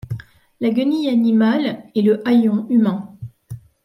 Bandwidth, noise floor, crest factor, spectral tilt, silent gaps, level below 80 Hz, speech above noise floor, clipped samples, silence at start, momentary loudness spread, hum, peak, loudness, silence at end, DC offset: 6 kHz; -37 dBFS; 12 dB; -8 dB/octave; none; -56 dBFS; 21 dB; under 0.1%; 0.05 s; 20 LU; none; -6 dBFS; -17 LUFS; 0.25 s; under 0.1%